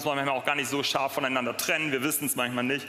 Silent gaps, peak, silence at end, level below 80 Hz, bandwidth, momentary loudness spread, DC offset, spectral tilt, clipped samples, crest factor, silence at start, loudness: none; -8 dBFS; 0 s; -76 dBFS; 16 kHz; 2 LU; under 0.1%; -2.5 dB/octave; under 0.1%; 20 dB; 0 s; -27 LUFS